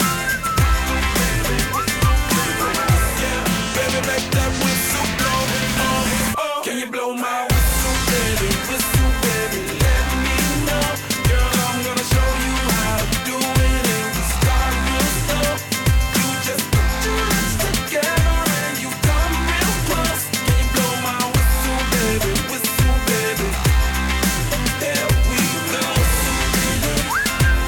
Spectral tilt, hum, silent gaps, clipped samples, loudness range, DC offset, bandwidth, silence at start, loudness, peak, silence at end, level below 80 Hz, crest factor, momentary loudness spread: -3.5 dB/octave; none; none; under 0.1%; 1 LU; under 0.1%; 18.5 kHz; 0 s; -19 LUFS; -6 dBFS; 0 s; -24 dBFS; 12 dB; 3 LU